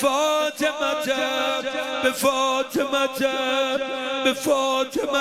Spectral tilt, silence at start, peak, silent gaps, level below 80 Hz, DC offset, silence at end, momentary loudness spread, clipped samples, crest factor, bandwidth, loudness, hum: -2 dB/octave; 0 s; -8 dBFS; none; -60 dBFS; under 0.1%; 0 s; 3 LU; under 0.1%; 16 dB; 16 kHz; -22 LUFS; none